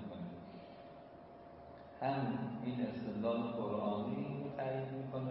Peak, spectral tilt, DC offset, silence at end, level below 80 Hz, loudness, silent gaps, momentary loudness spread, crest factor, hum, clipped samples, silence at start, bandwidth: -24 dBFS; -7 dB/octave; under 0.1%; 0 s; -72 dBFS; -40 LUFS; none; 17 LU; 16 dB; none; under 0.1%; 0 s; 5.6 kHz